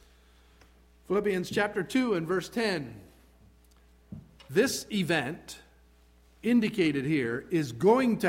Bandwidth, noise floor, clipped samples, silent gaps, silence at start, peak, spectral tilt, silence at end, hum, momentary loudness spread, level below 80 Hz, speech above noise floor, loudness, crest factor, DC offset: 16.5 kHz; -60 dBFS; under 0.1%; none; 1.1 s; -10 dBFS; -5 dB/octave; 0 s; none; 20 LU; -60 dBFS; 32 dB; -28 LUFS; 18 dB; under 0.1%